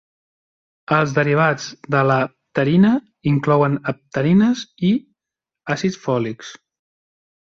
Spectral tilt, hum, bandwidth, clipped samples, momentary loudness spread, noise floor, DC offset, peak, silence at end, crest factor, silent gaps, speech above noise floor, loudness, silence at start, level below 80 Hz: -7 dB/octave; none; 7.6 kHz; under 0.1%; 10 LU; -87 dBFS; under 0.1%; -2 dBFS; 1 s; 16 dB; none; 69 dB; -19 LUFS; 0.9 s; -58 dBFS